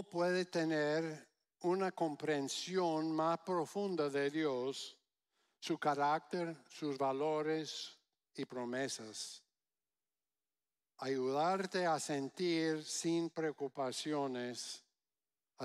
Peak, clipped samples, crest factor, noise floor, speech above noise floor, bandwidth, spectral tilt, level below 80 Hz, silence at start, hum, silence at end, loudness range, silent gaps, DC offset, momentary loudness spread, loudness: -22 dBFS; under 0.1%; 16 dB; under -90 dBFS; over 52 dB; 14 kHz; -4.5 dB/octave; under -90 dBFS; 0 s; none; 0 s; 5 LU; none; under 0.1%; 11 LU; -38 LUFS